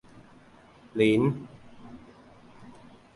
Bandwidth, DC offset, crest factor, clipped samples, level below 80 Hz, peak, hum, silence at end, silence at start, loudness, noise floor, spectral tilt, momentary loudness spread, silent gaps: 11.5 kHz; under 0.1%; 22 dB; under 0.1%; -62 dBFS; -8 dBFS; none; 0.45 s; 0.95 s; -26 LUFS; -54 dBFS; -7.5 dB/octave; 28 LU; none